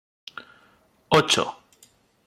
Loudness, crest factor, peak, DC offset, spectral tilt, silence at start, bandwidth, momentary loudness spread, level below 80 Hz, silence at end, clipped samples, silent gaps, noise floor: -21 LUFS; 22 dB; -6 dBFS; under 0.1%; -3 dB/octave; 1.1 s; 15.5 kHz; 23 LU; -60 dBFS; 0.75 s; under 0.1%; none; -60 dBFS